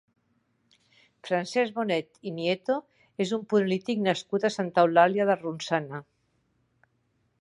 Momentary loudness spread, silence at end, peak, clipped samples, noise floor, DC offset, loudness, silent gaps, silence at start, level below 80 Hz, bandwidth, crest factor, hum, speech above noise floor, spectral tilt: 11 LU; 1.4 s; -6 dBFS; under 0.1%; -72 dBFS; under 0.1%; -27 LUFS; none; 1.25 s; -76 dBFS; 11 kHz; 22 dB; none; 46 dB; -5.5 dB/octave